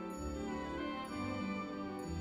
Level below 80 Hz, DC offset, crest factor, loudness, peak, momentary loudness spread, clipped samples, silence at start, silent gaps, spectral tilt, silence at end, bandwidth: -54 dBFS; under 0.1%; 12 dB; -41 LUFS; -30 dBFS; 3 LU; under 0.1%; 0 s; none; -6 dB/octave; 0 s; 15.5 kHz